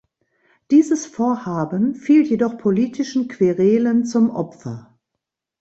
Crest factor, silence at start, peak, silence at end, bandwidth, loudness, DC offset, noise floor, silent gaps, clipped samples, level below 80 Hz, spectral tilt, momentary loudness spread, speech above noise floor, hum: 14 dB; 0.7 s; -4 dBFS; 0.8 s; 8 kHz; -18 LUFS; under 0.1%; -81 dBFS; none; under 0.1%; -62 dBFS; -7 dB/octave; 11 LU; 63 dB; none